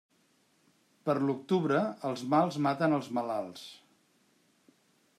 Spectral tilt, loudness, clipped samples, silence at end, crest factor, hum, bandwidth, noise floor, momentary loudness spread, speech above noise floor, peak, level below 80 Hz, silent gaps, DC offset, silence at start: -7 dB/octave; -31 LUFS; under 0.1%; 1.4 s; 20 dB; none; 13.5 kHz; -70 dBFS; 11 LU; 40 dB; -12 dBFS; -80 dBFS; none; under 0.1%; 1.05 s